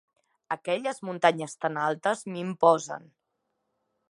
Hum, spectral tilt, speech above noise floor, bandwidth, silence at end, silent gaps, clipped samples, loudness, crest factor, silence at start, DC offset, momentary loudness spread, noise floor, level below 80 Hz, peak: none; -4.5 dB/octave; 53 dB; 11.5 kHz; 1.1 s; none; under 0.1%; -27 LUFS; 24 dB; 0.5 s; under 0.1%; 12 LU; -80 dBFS; -82 dBFS; -6 dBFS